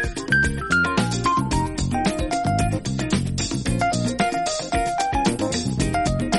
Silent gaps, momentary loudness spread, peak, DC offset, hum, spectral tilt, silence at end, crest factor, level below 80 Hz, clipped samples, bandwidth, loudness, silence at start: none; 4 LU; -6 dBFS; under 0.1%; none; -4.5 dB/octave; 0 s; 16 dB; -34 dBFS; under 0.1%; 11.5 kHz; -22 LUFS; 0 s